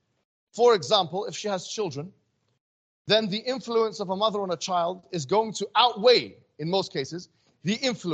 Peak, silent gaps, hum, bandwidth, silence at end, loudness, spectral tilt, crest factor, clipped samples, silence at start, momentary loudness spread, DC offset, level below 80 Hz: -6 dBFS; 2.60-3.05 s; none; 8.6 kHz; 0 s; -25 LUFS; -4 dB/octave; 20 dB; under 0.1%; 0.55 s; 15 LU; under 0.1%; -74 dBFS